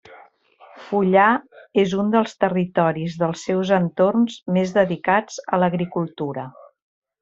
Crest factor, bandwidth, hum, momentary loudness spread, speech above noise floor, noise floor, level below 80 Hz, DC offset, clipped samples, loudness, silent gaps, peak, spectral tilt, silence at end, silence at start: 18 dB; 7.8 kHz; none; 8 LU; 31 dB; -51 dBFS; -62 dBFS; under 0.1%; under 0.1%; -20 LUFS; none; -2 dBFS; -6.5 dB/octave; 0.7 s; 0.1 s